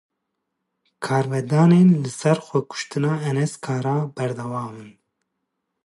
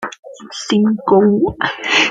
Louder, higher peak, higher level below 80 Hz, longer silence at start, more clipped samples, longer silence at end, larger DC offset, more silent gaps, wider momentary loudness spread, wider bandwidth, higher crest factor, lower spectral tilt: second, -21 LUFS vs -14 LUFS; second, -6 dBFS vs 0 dBFS; second, -68 dBFS vs -48 dBFS; first, 1 s vs 0 s; neither; first, 0.95 s vs 0 s; neither; second, none vs 0.19-0.23 s; second, 13 LU vs 17 LU; first, 11.5 kHz vs 9 kHz; about the same, 16 dB vs 14 dB; first, -7 dB/octave vs -4.5 dB/octave